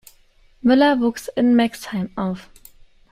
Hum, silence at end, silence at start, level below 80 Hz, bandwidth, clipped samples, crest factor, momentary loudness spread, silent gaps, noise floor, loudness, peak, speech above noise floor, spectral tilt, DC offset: none; 0.7 s; 0.65 s; -52 dBFS; 15 kHz; under 0.1%; 16 dB; 12 LU; none; -53 dBFS; -19 LUFS; -4 dBFS; 35 dB; -6 dB/octave; under 0.1%